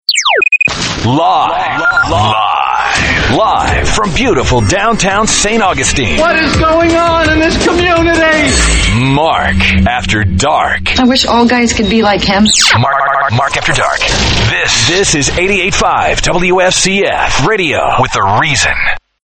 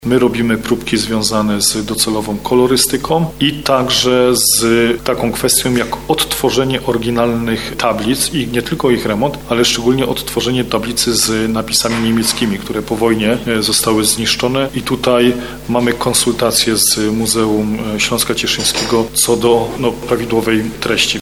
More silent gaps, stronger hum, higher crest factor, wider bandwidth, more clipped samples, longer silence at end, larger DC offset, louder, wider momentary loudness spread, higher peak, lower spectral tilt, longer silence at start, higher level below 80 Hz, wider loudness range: neither; neither; about the same, 10 dB vs 14 dB; about the same, over 20 kHz vs over 20 kHz; neither; first, 0.25 s vs 0 s; second, under 0.1% vs 0.6%; first, -9 LUFS vs -14 LUFS; second, 3 LU vs 6 LU; about the same, 0 dBFS vs 0 dBFS; about the same, -3.5 dB/octave vs -3.5 dB/octave; about the same, 0.1 s vs 0 s; first, -22 dBFS vs -36 dBFS; about the same, 1 LU vs 2 LU